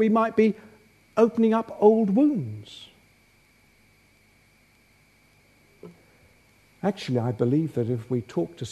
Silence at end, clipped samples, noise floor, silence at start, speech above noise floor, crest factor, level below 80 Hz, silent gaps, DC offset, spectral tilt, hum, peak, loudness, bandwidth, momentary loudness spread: 0 s; under 0.1%; -60 dBFS; 0 s; 37 dB; 22 dB; -66 dBFS; none; under 0.1%; -8 dB/octave; 50 Hz at -65 dBFS; -4 dBFS; -24 LUFS; 11 kHz; 14 LU